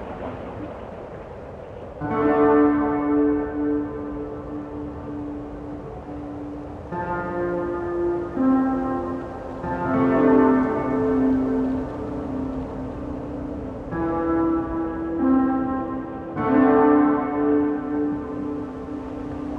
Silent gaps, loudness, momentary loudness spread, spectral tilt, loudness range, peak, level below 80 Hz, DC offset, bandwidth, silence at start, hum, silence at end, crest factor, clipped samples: none; -23 LUFS; 17 LU; -9.5 dB/octave; 9 LU; -4 dBFS; -44 dBFS; under 0.1%; 4.7 kHz; 0 s; none; 0 s; 18 dB; under 0.1%